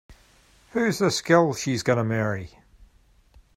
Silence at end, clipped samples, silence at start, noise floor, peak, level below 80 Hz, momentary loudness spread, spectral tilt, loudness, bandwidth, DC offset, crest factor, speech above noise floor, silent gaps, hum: 1.1 s; under 0.1%; 0.1 s; -58 dBFS; -4 dBFS; -56 dBFS; 12 LU; -5 dB/octave; -23 LUFS; 16 kHz; under 0.1%; 20 dB; 35 dB; none; none